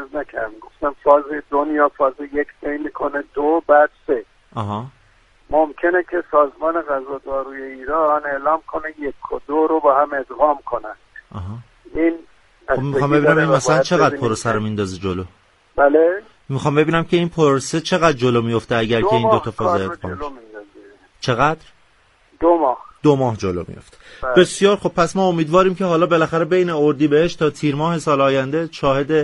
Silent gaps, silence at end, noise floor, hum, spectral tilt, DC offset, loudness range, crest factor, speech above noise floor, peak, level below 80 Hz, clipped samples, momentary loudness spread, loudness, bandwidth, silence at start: none; 0 s; -55 dBFS; none; -6 dB/octave; under 0.1%; 4 LU; 18 dB; 38 dB; 0 dBFS; -46 dBFS; under 0.1%; 14 LU; -18 LUFS; 11.5 kHz; 0 s